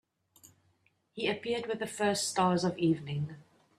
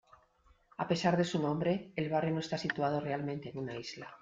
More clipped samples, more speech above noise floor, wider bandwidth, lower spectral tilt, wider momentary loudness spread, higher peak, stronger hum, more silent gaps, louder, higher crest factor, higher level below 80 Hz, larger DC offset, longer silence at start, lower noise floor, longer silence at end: neither; first, 41 dB vs 34 dB; first, 14.5 kHz vs 7.8 kHz; second, -4.5 dB/octave vs -6 dB/octave; about the same, 9 LU vs 11 LU; about the same, -14 dBFS vs -14 dBFS; neither; neither; about the same, -32 LUFS vs -34 LUFS; about the same, 18 dB vs 20 dB; about the same, -72 dBFS vs -68 dBFS; neither; second, 0.45 s vs 0.8 s; first, -72 dBFS vs -67 dBFS; first, 0.35 s vs 0.05 s